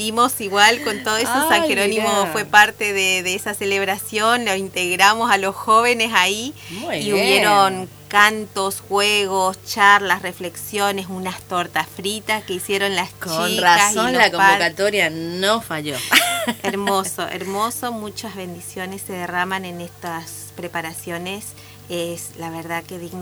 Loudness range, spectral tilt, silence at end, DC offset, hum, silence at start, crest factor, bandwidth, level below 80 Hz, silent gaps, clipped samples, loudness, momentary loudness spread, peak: 11 LU; -2 dB/octave; 0 s; under 0.1%; none; 0 s; 20 dB; over 20 kHz; -58 dBFS; none; under 0.1%; -18 LUFS; 16 LU; 0 dBFS